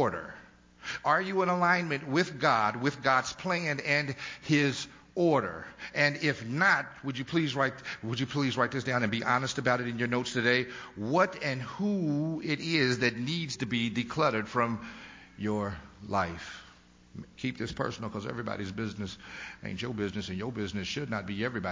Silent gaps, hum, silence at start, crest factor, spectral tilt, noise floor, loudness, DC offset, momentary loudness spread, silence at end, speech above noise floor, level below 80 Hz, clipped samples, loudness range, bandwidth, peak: none; none; 0 s; 20 dB; -5 dB/octave; -57 dBFS; -30 LUFS; under 0.1%; 13 LU; 0 s; 27 dB; -58 dBFS; under 0.1%; 8 LU; 7.6 kHz; -10 dBFS